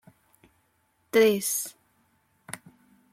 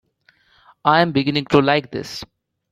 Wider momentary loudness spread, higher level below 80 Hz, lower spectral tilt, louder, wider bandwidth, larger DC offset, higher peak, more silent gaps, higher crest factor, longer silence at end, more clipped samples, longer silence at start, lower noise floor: first, 21 LU vs 14 LU; second, -74 dBFS vs -54 dBFS; second, -3 dB/octave vs -6 dB/octave; second, -24 LUFS vs -18 LUFS; first, 16.5 kHz vs 14 kHz; neither; second, -8 dBFS vs -2 dBFS; neither; about the same, 20 dB vs 18 dB; about the same, 0.55 s vs 0.5 s; neither; first, 1.15 s vs 0.85 s; first, -70 dBFS vs -59 dBFS